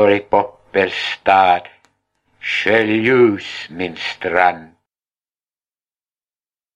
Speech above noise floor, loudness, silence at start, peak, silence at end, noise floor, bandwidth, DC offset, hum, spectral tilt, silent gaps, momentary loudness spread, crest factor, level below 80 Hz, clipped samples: over 74 dB; -16 LUFS; 0 s; 0 dBFS; 2.1 s; under -90 dBFS; 9 kHz; under 0.1%; none; -5.5 dB/octave; none; 12 LU; 18 dB; -58 dBFS; under 0.1%